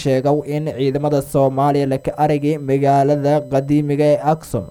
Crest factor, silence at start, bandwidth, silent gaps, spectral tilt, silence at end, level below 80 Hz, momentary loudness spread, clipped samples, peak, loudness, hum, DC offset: 14 dB; 0 s; 17.5 kHz; none; -7.5 dB/octave; 0 s; -46 dBFS; 5 LU; under 0.1%; -4 dBFS; -17 LUFS; none; under 0.1%